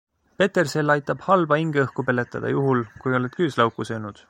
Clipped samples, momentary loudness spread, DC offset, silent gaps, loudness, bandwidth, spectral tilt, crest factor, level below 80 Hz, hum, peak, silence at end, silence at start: under 0.1%; 5 LU; under 0.1%; none; -22 LUFS; 16.5 kHz; -6.5 dB/octave; 18 dB; -60 dBFS; none; -4 dBFS; 0.15 s; 0.4 s